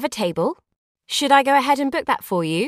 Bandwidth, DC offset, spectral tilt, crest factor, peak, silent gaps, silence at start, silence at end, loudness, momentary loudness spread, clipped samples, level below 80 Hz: 15.5 kHz; under 0.1%; -4 dB/octave; 18 dB; -2 dBFS; 0.76-0.95 s; 0 s; 0 s; -19 LUFS; 10 LU; under 0.1%; -62 dBFS